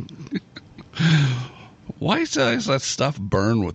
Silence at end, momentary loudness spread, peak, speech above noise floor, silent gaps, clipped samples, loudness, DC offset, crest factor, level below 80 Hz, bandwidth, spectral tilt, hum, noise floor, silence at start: 0 s; 18 LU; -6 dBFS; 22 dB; none; under 0.1%; -22 LUFS; under 0.1%; 18 dB; -48 dBFS; 8.4 kHz; -5 dB/octave; none; -43 dBFS; 0 s